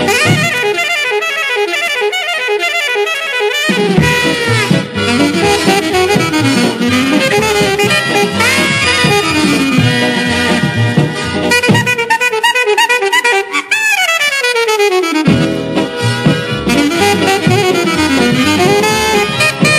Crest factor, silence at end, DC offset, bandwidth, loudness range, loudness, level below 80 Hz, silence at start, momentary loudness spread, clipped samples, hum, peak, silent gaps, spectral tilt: 12 dB; 0 s; under 0.1%; 15.5 kHz; 2 LU; -11 LUFS; -40 dBFS; 0 s; 4 LU; under 0.1%; none; 0 dBFS; none; -4 dB/octave